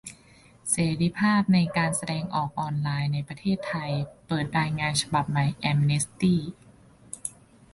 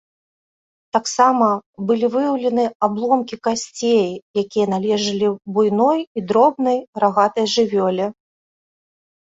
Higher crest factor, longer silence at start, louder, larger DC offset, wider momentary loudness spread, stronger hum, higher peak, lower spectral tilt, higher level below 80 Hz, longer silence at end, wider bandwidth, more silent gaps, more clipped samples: about the same, 18 dB vs 18 dB; second, 0.05 s vs 0.95 s; second, -26 LUFS vs -18 LUFS; neither; first, 13 LU vs 7 LU; neither; second, -10 dBFS vs -2 dBFS; about the same, -5 dB/octave vs -5 dB/octave; first, -56 dBFS vs -64 dBFS; second, 0.45 s vs 1.1 s; first, 11.5 kHz vs 8.2 kHz; second, none vs 1.66-1.73 s, 2.75-2.80 s, 4.22-4.34 s, 6.07-6.15 s, 6.88-6.93 s; neither